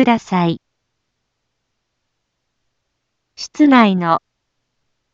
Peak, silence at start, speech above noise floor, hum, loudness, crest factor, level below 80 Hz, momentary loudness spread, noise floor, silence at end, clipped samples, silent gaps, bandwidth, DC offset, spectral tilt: 0 dBFS; 0 s; 59 dB; none; -14 LUFS; 18 dB; -62 dBFS; 19 LU; -73 dBFS; 0.95 s; under 0.1%; none; 7.6 kHz; under 0.1%; -6.5 dB/octave